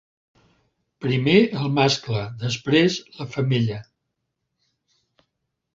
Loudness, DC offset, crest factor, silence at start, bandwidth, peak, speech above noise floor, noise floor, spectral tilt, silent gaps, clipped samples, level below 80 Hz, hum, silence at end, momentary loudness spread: -21 LUFS; under 0.1%; 22 dB; 1 s; 7.8 kHz; -2 dBFS; 57 dB; -78 dBFS; -5.5 dB/octave; none; under 0.1%; -58 dBFS; none; 1.95 s; 13 LU